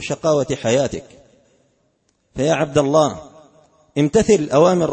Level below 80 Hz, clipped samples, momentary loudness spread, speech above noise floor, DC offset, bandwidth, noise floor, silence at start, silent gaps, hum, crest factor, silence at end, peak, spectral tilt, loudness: -46 dBFS; under 0.1%; 13 LU; 48 dB; under 0.1%; 8.8 kHz; -65 dBFS; 0 s; none; none; 16 dB; 0 s; -2 dBFS; -5.5 dB/octave; -17 LUFS